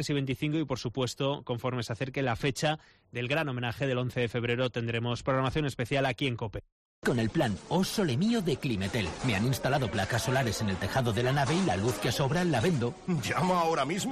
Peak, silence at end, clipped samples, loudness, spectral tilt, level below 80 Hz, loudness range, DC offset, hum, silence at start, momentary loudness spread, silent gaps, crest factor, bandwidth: -16 dBFS; 0 s; under 0.1%; -30 LUFS; -5.5 dB/octave; -52 dBFS; 3 LU; under 0.1%; none; 0 s; 6 LU; 6.72-7.02 s; 12 dB; 13.5 kHz